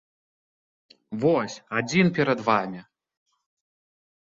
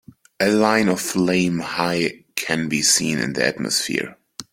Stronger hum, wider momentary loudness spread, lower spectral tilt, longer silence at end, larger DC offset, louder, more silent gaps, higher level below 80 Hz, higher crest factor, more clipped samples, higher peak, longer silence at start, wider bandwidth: neither; first, 14 LU vs 8 LU; first, -6 dB/octave vs -3 dB/octave; first, 1.5 s vs 0.1 s; neither; second, -24 LUFS vs -20 LUFS; neither; second, -66 dBFS vs -58 dBFS; about the same, 22 dB vs 20 dB; neither; second, -6 dBFS vs 0 dBFS; first, 1.1 s vs 0.4 s; second, 7.8 kHz vs 16.5 kHz